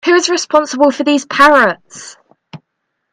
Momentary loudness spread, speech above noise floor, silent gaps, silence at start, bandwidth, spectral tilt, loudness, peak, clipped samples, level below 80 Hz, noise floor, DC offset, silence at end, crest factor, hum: 19 LU; 59 dB; none; 0.05 s; 15 kHz; -2.5 dB/octave; -11 LUFS; 0 dBFS; under 0.1%; -52 dBFS; -71 dBFS; under 0.1%; 0.55 s; 14 dB; none